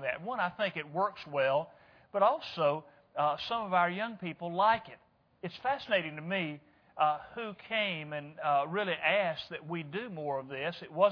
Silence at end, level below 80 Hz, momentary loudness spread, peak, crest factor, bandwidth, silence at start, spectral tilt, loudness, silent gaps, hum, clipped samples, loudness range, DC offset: 0 s; -74 dBFS; 11 LU; -12 dBFS; 20 dB; 5.4 kHz; 0 s; -6.5 dB/octave; -33 LUFS; none; none; under 0.1%; 3 LU; under 0.1%